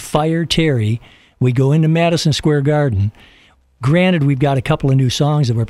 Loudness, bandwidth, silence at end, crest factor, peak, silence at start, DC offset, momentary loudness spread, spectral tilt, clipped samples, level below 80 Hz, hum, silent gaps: -15 LUFS; 13 kHz; 0 s; 14 dB; -2 dBFS; 0 s; under 0.1%; 6 LU; -6.5 dB/octave; under 0.1%; -40 dBFS; none; none